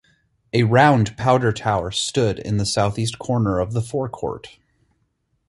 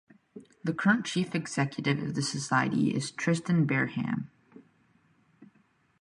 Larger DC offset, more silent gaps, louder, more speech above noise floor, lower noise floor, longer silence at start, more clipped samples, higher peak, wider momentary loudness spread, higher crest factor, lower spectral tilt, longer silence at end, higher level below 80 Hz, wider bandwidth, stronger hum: neither; neither; first, -20 LUFS vs -29 LUFS; first, 49 dB vs 39 dB; about the same, -69 dBFS vs -67 dBFS; first, 0.55 s vs 0.35 s; neither; first, -2 dBFS vs -12 dBFS; first, 11 LU vs 8 LU; about the same, 18 dB vs 20 dB; about the same, -5.5 dB/octave vs -5.5 dB/octave; first, 1 s vs 0.55 s; first, -46 dBFS vs -68 dBFS; about the same, 11.5 kHz vs 11.5 kHz; neither